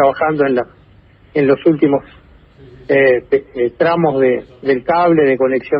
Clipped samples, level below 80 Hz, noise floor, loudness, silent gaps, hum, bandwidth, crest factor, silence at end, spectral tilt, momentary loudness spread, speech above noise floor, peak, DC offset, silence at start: under 0.1%; -50 dBFS; -46 dBFS; -14 LUFS; none; none; 5.4 kHz; 14 dB; 0 s; -10.5 dB/octave; 8 LU; 32 dB; 0 dBFS; under 0.1%; 0 s